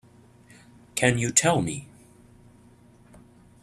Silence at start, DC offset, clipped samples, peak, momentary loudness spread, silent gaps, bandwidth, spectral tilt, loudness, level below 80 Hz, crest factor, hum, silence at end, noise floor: 0.95 s; under 0.1%; under 0.1%; -4 dBFS; 14 LU; none; 14.5 kHz; -3.5 dB/octave; -23 LUFS; -58 dBFS; 26 dB; none; 1.75 s; -54 dBFS